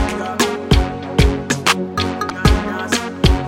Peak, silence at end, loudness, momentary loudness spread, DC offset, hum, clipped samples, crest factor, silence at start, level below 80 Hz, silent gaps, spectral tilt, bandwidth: 0 dBFS; 0 s; -18 LUFS; 4 LU; under 0.1%; none; under 0.1%; 16 dB; 0 s; -22 dBFS; none; -4.5 dB/octave; 16.5 kHz